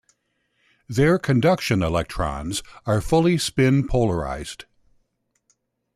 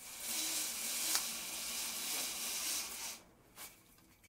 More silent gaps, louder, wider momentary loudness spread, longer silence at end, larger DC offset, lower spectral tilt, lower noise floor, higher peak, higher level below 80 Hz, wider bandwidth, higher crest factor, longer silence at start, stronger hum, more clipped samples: neither; first, -21 LUFS vs -37 LUFS; second, 11 LU vs 18 LU; first, 1.35 s vs 0 s; neither; first, -6 dB/octave vs 1.5 dB/octave; first, -71 dBFS vs -65 dBFS; first, -8 dBFS vs -12 dBFS; first, -40 dBFS vs -74 dBFS; second, 14 kHz vs 16 kHz; second, 16 dB vs 30 dB; first, 0.9 s vs 0 s; neither; neither